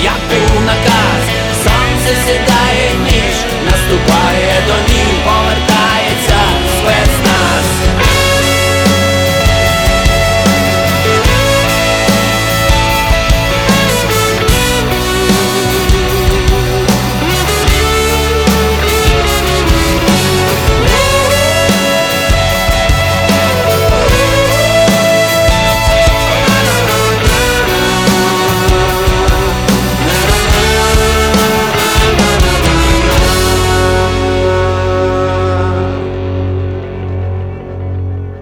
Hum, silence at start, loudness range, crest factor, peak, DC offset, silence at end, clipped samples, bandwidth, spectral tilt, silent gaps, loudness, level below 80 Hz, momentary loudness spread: none; 0 s; 2 LU; 10 dB; 0 dBFS; under 0.1%; 0 s; under 0.1%; over 20 kHz; -4 dB/octave; none; -10 LUFS; -18 dBFS; 3 LU